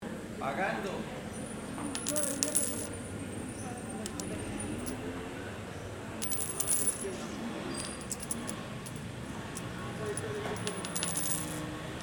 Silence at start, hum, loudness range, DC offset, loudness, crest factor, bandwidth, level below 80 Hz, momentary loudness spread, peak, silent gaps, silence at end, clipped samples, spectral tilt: 0 s; none; 5 LU; under 0.1%; -35 LUFS; 34 dB; over 20 kHz; -56 dBFS; 12 LU; -2 dBFS; none; 0 s; under 0.1%; -3.5 dB/octave